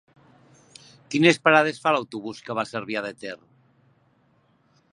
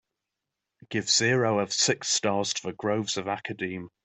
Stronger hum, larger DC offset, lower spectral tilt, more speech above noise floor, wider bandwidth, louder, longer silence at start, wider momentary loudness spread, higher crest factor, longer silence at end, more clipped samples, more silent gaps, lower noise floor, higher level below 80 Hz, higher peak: neither; neither; first, -5 dB/octave vs -2.5 dB/octave; second, 41 dB vs 58 dB; first, 11 kHz vs 8.4 kHz; first, -22 LUFS vs -26 LUFS; first, 1.1 s vs 0.9 s; first, 18 LU vs 11 LU; first, 24 dB vs 18 dB; first, 1.55 s vs 0.15 s; neither; neither; second, -63 dBFS vs -86 dBFS; second, -74 dBFS vs -68 dBFS; first, -2 dBFS vs -10 dBFS